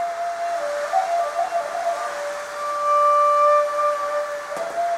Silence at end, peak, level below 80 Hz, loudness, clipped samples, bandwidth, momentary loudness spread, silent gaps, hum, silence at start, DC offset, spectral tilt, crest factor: 0 s; -8 dBFS; -68 dBFS; -21 LUFS; under 0.1%; 15 kHz; 12 LU; none; none; 0 s; under 0.1%; -1 dB/octave; 14 dB